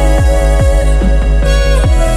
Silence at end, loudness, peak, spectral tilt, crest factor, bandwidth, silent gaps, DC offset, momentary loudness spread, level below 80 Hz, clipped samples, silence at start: 0 s; -11 LUFS; 0 dBFS; -6 dB/octave; 8 dB; 12 kHz; none; under 0.1%; 1 LU; -10 dBFS; under 0.1%; 0 s